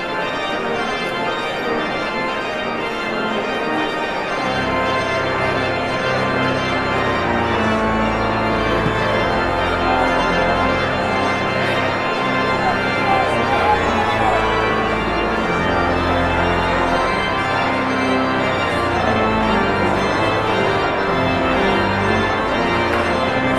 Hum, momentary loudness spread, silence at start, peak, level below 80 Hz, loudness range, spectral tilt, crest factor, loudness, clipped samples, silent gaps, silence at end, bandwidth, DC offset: none; 4 LU; 0 s; -4 dBFS; -36 dBFS; 3 LU; -5.5 dB/octave; 14 dB; -18 LUFS; under 0.1%; none; 0 s; 14.5 kHz; under 0.1%